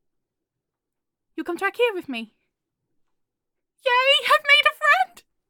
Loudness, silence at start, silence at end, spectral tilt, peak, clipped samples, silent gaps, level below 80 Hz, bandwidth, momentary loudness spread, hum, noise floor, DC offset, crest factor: -19 LUFS; 1.35 s; 0.45 s; -0.5 dB/octave; -4 dBFS; under 0.1%; none; -76 dBFS; 17.5 kHz; 18 LU; none; -84 dBFS; under 0.1%; 20 dB